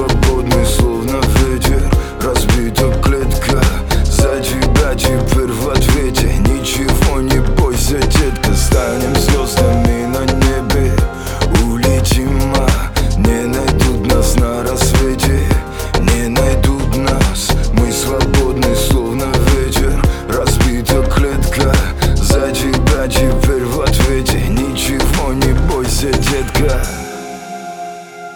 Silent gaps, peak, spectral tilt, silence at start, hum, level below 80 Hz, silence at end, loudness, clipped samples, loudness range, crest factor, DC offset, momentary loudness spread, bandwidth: none; 0 dBFS; -5 dB/octave; 0 s; none; -16 dBFS; 0 s; -14 LUFS; under 0.1%; 1 LU; 12 dB; under 0.1%; 3 LU; 20 kHz